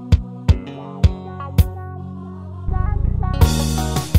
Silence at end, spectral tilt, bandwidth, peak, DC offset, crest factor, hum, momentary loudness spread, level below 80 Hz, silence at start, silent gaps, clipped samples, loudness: 0 s; -6 dB/octave; 16 kHz; 0 dBFS; under 0.1%; 18 dB; none; 15 LU; -22 dBFS; 0 s; none; under 0.1%; -20 LUFS